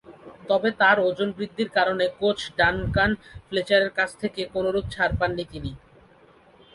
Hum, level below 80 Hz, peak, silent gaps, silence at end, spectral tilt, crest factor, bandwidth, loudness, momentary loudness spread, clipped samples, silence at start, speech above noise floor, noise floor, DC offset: none; -44 dBFS; -4 dBFS; none; 1 s; -5.5 dB/octave; 20 dB; 11.5 kHz; -23 LUFS; 12 LU; under 0.1%; 0.1 s; 31 dB; -54 dBFS; under 0.1%